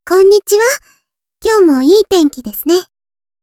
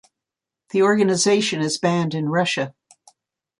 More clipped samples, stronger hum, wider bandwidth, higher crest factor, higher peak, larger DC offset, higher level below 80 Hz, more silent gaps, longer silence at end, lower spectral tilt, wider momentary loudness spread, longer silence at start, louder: neither; neither; first, 18 kHz vs 11.5 kHz; about the same, 12 dB vs 16 dB; first, 0 dBFS vs -6 dBFS; neither; first, -48 dBFS vs -66 dBFS; neither; second, 0.6 s vs 0.9 s; second, -2.5 dB/octave vs -4.5 dB/octave; about the same, 10 LU vs 8 LU; second, 0.05 s vs 0.75 s; first, -11 LUFS vs -20 LUFS